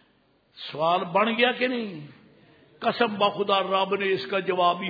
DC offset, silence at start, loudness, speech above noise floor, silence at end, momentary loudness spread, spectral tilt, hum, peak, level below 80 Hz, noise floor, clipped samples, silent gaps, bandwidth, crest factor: under 0.1%; 0.55 s; -24 LUFS; 40 dB; 0 s; 11 LU; -7 dB/octave; none; -6 dBFS; -74 dBFS; -64 dBFS; under 0.1%; none; 5 kHz; 18 dB